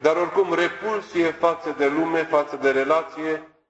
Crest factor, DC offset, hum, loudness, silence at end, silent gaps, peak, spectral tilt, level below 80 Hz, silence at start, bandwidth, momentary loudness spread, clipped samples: 18 dB; under 0.1%; none; -22 LUFS; 0.25 s; none; -4 dBFS; -5 dB/octave; -66 dBFS; 0 s; 8.2 kHz; 7 LU; under 0.1%